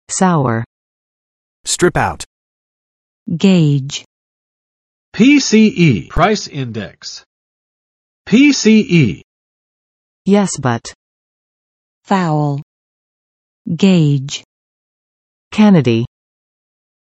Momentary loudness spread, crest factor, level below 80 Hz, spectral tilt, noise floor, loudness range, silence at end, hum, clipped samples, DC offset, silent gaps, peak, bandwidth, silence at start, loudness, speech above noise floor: 19 LU; 16 dB; -42 dBFS; -5.5 dB/octave; under -90 dBFS; 5 LU; 1.05 s; none; under 0.1%; under 0.1%; 0.66-1.64 s, 2.26-3.26 s, 4.06-5.12 s, 7.26-8.25 s, 9.24-10.25 s, 10.95-12.02 s, 12.62-13.65 s, 14.45-15.51 s; 0 dBFS; 12 kHz; 0.1 s; -13 LUFS; over 78 dB